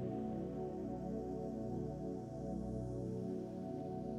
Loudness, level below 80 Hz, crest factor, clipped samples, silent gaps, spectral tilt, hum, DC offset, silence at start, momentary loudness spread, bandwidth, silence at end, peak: -44 LUFS; -58 dBFS; 12 dB; under 0.1%; none; -9.5 dB/octave; 60 Hz at -65 dBFS; under 0.1%; 0 s; 2 LU; 12 kHz; 0 s; -30 dBFS